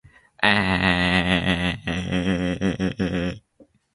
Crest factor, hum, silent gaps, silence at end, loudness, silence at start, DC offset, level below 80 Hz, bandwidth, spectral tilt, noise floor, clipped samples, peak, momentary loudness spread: 22 dB; none; none; 0.3 s; -22 LUFS; 0.4 s; under 0.1%; -40 dBFS; 11.5 kHz; -5.5 dB/octave; -56 dBFS; under 0.1%; 0 dBFS; 8 LU